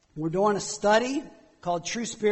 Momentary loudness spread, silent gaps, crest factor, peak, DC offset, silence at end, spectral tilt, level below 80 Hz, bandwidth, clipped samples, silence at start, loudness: 9 LU; none; 16 dB; -10 dBFS; under 0.1%; 0 s; -4 dB/octave; -58 dBFS; 8.4 kHz; under 0.1%; 0.15 s; -26 LUFS